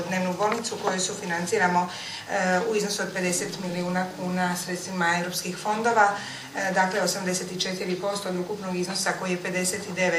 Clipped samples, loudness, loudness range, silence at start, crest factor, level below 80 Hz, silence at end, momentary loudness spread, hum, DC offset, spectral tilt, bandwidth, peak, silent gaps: under 0.1%; -26 LUFS; 2 LU; 0 s; 20 dB; -66 dBFS; 0 s; 7 LU; none; under 0.1%; -3.5 dB/octave; 15.5 kHz; -6 dBFS; none